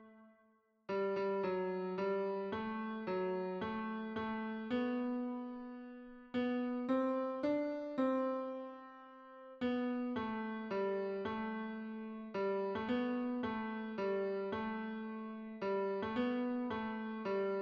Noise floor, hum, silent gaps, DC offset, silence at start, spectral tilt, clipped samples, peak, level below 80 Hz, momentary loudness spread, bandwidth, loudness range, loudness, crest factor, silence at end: -73 dBFS; none; none; under 0.1%; 0 s; -8 dB/octave; under 0.1%; -24 dBFS; -74 dBFS; 9 LU; 6.2 kHz; 2 LU; -39 LUFS; 14 dB; 0 s